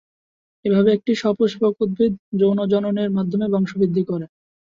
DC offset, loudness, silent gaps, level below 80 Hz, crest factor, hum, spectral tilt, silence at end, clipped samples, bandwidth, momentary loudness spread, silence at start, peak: under 0.1%; -20 LUFS; 2.19-2.32 s; -58 dBFS; 16 dB; none; -8 dB/octave; 0.4 s; under 0.1%; 7.4 kHz; 6 LU; 0.65 s; -4 dBFS